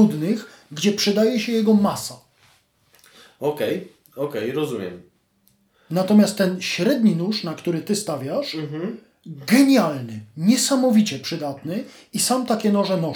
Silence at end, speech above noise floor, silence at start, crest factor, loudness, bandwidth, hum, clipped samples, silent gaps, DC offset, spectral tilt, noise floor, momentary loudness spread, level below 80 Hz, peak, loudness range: 0 s; 42 dB; 0 s; 18 dB; -21 LUFS; over 20 kHz; none; under 0.1%; none; under 0.1%; -5 dB/octave; -63 dBFS; 14 LU; -70 dBFS; -4 dBFS; 8 LU